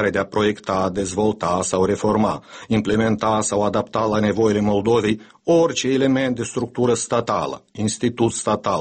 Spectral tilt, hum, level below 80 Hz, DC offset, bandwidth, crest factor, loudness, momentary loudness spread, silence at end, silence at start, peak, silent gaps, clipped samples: -5 dB/octave; none; -50 dBFS; under 0.1%; 8.8 kHz; 14 dB; -20 LUFS; 6 LU; 0 s; 0 s; -6 dBFS; none; under 0.1%